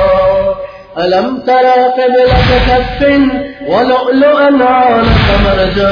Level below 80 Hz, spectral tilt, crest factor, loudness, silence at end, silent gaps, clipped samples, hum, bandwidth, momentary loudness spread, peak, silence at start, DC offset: -20 dBFS; -7.5 dB/octave; 8 dB; -9 LUFS; 0 s; none; under 0.1%; none; 5.4 kHz; 6 LU; 0 dBFS; 0 s; under 0.1%